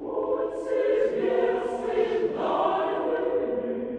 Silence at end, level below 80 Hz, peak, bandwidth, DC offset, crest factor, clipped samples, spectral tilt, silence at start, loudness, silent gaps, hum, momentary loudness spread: 0 s; -60 dBFS; -12 dBFS; 9.6 kHz; under 0.1%; 14 dB; under 0.1%; -6 dB/octave; 0 s; -26 LUFS; none; none; 4 LU